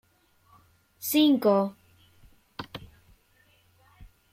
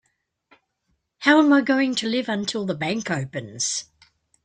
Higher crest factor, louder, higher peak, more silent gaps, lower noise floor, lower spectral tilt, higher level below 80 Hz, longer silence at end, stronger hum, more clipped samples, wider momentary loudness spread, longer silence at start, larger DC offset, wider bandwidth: about the same, 20 dB vs 20 dB; about the same, -24 LUFS vs -22 LUFS; second, -10 dBFS vs -4 dBFS; neither; second, -64 dBFS vs -73 dBFS; about the same, -4.5 dB/octave vs -3.5 dB/octave; about the same, -62 dBFS vs -66 dBFS; second, 0.3 s vs 0.6 s; neither; neither; first, 23 LU vs 11 LU; second, 1 s vs 1.2 s; neither; first, 16.5 kHz vs 9.4 kHz